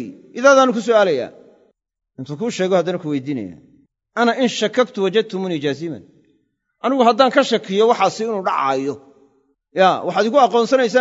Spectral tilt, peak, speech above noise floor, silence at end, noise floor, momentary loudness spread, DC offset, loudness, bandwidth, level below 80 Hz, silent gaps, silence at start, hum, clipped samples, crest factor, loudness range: -4.5 dB/octave; 0 dBFS; 49 dB; 0 s; -65 dBFS; 15 LU; under 0.1%; -17 LUFS; 8 kHz; -70 dBFS; none; 0 s; none; under 0.1%; 18 dB; 4 LU